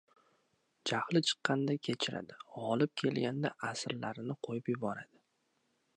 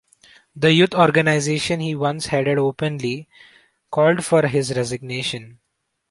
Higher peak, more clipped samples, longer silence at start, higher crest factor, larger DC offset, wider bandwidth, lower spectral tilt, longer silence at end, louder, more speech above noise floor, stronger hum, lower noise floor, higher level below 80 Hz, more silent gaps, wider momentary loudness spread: second, -14 dBFS vs -2 dBFS; neither; first, 0.85 s vs 0.55 s; first, 24 dB vs 18 dB; neither; about the same, 11.5 kHz vs 11.5 kHz; about the same, -5 dB/octave vs -5 dB/octave; first, 0.9 s vs 0.6 s; second, -36 LUFS vs -19 LUFS; second, 43 dB vs 55 dB; neither; first, -78 dBFS vs -74 dBFS; second, -80 dBFS vs -56 dBFS; neither; about the same, 10 LU vs 11 LU